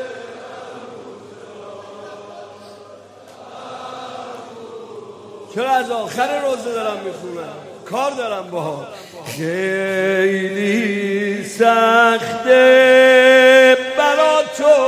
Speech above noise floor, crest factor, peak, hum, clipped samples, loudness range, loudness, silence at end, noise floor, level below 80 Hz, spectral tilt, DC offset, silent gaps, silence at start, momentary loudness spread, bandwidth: 25 dB; 16 dB; 0 dBFS; none; under 0.1%; 24 LU; -14 LUFS; 0 s; -41 dBFS; -68 dBFS; -4 dB/octave; under 0.1%; none; 0 s; 26 LU; 15 kHz